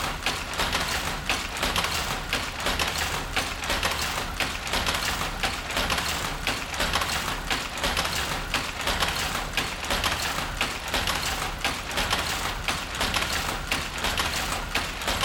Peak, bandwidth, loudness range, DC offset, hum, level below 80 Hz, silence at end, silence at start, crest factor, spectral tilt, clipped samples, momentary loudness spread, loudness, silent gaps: -8 dBFS; 19 kHz; 0 LU; under 0.1%; none; -38 dBFS; 0 s; 0 s; 18 dB; -2 dB/octave; under 0.1%; 3 LU; -26 LUFS; none